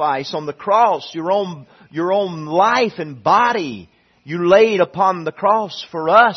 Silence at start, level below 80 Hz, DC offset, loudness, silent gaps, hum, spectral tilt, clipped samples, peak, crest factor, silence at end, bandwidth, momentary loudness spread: 0 s; -62 dBFS; under 0.1%; -17 LUFS; none; none; -5.5 dB/octave; under 0.1%; 0 dBFS; 16 dB; 0 s; 6.4 kHz; 14 LU